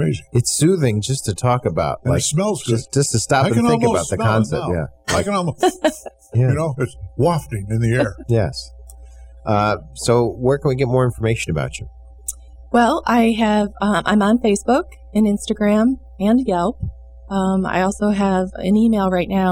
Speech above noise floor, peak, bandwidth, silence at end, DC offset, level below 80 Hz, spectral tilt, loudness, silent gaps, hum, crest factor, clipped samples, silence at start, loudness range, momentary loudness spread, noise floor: 22 dB; -4 dBFS; 16.5 kHz; 0 s; under 0.1%; -40 dBFS; -5.5 dB/octave; -18 LUFS; none; none; 14 dB; under 0.1%; 0 s; 3 LU; 8 LU; -39 dBFS